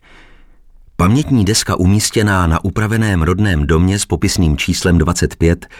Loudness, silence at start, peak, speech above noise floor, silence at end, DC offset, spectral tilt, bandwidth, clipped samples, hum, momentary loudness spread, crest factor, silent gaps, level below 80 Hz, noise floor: -14 LUFS; 1 s; -2 dBFS; 29 dB; 0 s; under 0.1%; -5 dB/octave; 16.5 kHz; under 0.1%; none; 3 LU; 12 dB; none; -26 dBFS; -43 dBFS